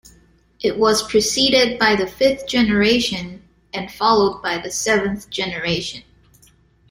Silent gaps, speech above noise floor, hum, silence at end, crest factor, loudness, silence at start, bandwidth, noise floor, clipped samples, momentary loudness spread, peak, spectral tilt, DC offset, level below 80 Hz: none; 36 dB; none; 0.9 s; 18 dB; -18 LUFS; 0.6 s; 16.5 kHz; -54 dBFS; under 0.1%; 14 LU; -2 dBFS; -3 dB/octave; under 0.1%; -46 dBFS